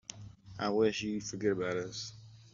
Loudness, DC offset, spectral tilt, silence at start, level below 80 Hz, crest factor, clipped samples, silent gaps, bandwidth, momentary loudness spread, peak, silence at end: -34 LUFS; under 0.1%; -4.5 dB/octave; 0.1 s; -66 dBFS; 18 dB; under 0.1%; none; 7.6 kHz; 19 LU; -18 dBFS; 0.05 s